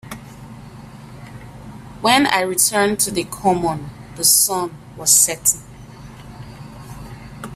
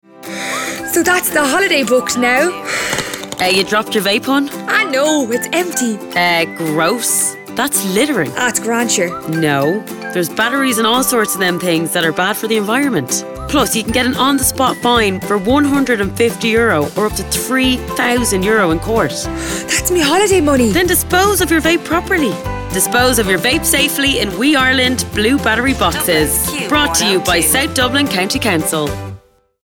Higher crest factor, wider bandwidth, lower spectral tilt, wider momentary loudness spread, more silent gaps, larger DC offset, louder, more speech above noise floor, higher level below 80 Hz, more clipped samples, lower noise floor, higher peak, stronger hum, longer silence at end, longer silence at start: first, 20 dB vs 14 dB; second, 16 kHz vs over 20 kHz; about the same, -2 dB/octave vs -3 dB/octave; first, 26 LU vs 6 LU; neither; neither; about the same, -16 LUFS vs -14 LUFS; second, 21 dB vs 25 dB; second, -46 dBFS vs -36 dBFS; neither; about the same, -38 dBFS vs -39 dBFS; about the same, 0 dBFS vs 0 dBFS; first, 50 Hz at -45 dBFS vs none; second, 0 s vs 0.45 s; about the same, 0.05 s vs 0.15 s